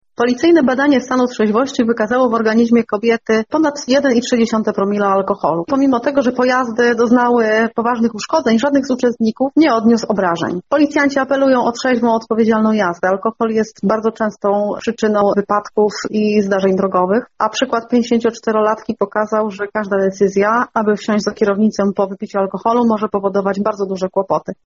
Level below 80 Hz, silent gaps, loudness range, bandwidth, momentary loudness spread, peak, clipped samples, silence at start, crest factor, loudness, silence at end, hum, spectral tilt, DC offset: -56 dBFS; none; 2 LU; 7.6 kHz; 5 LU; -2 dBFS; under 0.1%; 0.2 s; 12 dB; -15 LUFS; 0.1 s; none; -5.5 dB/octave; under 0.1%